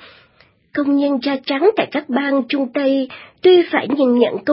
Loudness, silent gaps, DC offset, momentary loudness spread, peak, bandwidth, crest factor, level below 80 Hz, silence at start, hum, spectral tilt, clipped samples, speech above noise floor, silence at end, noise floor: -17 LUFS; none; under 0.1%; 8 LU; -2 dBFS; 5.8 kHz; 16 dB; -66 dBFS; 0.75 s; none; -9.5 dB/octave; under 0.1%; 38 dB; 0 s; -54 dBFS